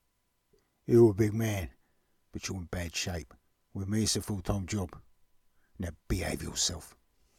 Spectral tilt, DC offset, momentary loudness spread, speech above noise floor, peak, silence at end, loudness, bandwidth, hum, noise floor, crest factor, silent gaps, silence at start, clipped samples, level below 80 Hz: -5 dB/octave; under 0.1%; 18 LU; 46 dB; -12 dBFS; 0.5 s; -31 LUFS; 16.5 kHz; none; -76 dBFS; 20 dB; none; 0.9 s; under 0.1%; -48 dBFS